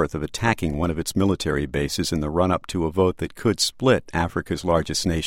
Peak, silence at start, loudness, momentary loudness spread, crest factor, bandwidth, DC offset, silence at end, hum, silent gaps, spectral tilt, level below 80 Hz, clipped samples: -4 dBFS; 0 s; -23 LUFS; 4 LU; 18 dB; 16.5 kHz; under 0.1%; 0 s; none; none; -5 dB/octave; -38 dBFS; under 0.1%